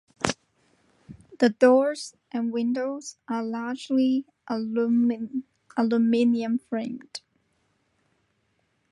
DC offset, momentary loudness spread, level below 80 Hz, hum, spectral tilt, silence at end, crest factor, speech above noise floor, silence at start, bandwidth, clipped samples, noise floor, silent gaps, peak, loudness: under 0.1%; 15 LU; -66 dBFS; none; -5 dB/octave; 1.75 s; 24 dB; 47 dB; 0.2 s; 11.5 kHz; under 0.1%; -71 dBFS; none; -2 dBFS; -25 LUFS